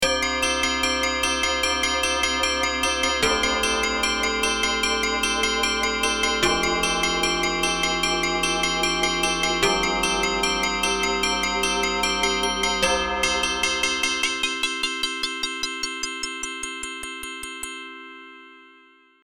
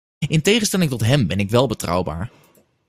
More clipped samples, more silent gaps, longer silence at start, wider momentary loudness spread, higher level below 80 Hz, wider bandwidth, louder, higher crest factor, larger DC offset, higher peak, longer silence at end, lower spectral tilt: neither; neither; second, 0 s vs 0.2 s; about the same, 9 LU vs 10 LU; about the same, -42 dBFS vs -44 dBFS; first, 19.5 kHz vs 16 kHz; second, -22 LUFS vs -19 LUFS; about the same, 18 dB vs 18 dB; first, 0.2% vs under 0.1%; second, -6 dBFS vs -2 dBFS; about the same, 0.5 s vs 0.6 s; second, -1.5 dB/octave vs -5 dB/octave